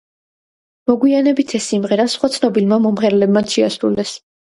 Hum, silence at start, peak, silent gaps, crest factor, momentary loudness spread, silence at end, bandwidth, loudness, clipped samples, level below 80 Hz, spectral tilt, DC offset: none; 0.9 s; 0 dBFS; none; 16 dB; 5 LU; 0.25 s; 11.5 kHz; -16 LUFS; under 0.1%; -56 dBFS; -5 dB/octave; under 0.1%